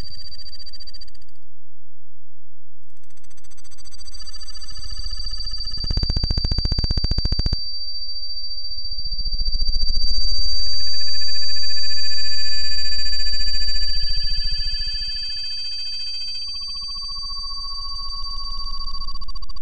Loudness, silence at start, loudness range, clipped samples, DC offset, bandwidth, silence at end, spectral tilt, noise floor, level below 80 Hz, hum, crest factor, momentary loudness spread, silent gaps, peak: -24 LUFS; 0 s; 15 LU; under 0.1%; under 0.1%; 8.6 kHz; 0 s; -3 dB/octave; -60 dBFS; -28 dBFS; none; 10 dB; 14 LU; none; -4 dBFS